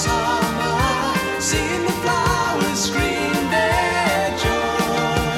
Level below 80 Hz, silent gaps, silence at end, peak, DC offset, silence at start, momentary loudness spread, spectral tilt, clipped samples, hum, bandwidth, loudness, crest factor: -34 dBFS; none; 0 s; -4 dBFS; under 0.1%; 0 s; 2 LU; -4 dB/octave; under 0.1%; none; 16.5 kHz; -19 LUFS; 16 dB